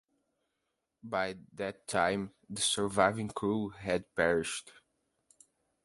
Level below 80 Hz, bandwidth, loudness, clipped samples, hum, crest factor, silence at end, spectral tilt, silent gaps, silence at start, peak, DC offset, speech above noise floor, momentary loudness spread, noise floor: -62 dBFS; 12 kHz; -33 LUFS; under 0.1%; none; 24 dB; 1.15 s; -3.5 dB/octave; none; 1.05 s; -10 dBFS; under 0.1%; 51 dB; 11 LU; -84 dBFS